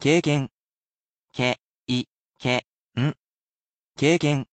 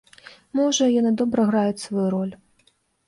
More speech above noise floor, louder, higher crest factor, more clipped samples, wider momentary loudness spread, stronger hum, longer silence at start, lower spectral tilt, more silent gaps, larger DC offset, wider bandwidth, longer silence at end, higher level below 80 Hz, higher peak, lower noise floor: first, over 68 dB vs 43 dB; second, -25 LUFS vs -22 LUFS; about the same, 18 dB vs 14 dB; neither; first, 15 LU vs 9 LU; neither; second, 0 s vs 0.55 s; about the same, -5.5 dB/octave vs -5 dB/octave; first, 0.52-1.28 s, 1.62-1.86 s, 2.11-2.34 s, 2.67-2.89 s, 3.19-3.85 s vs none; neither; second, 9 kHz vs 11.5 kHz; second, 0.1 s vs 0.7 s; about the same, -60 dBFS vs -64 dBFS; about the same, -8 dBFS vs -8 dBFS; first, under -90 dBFS vs -64 dBFS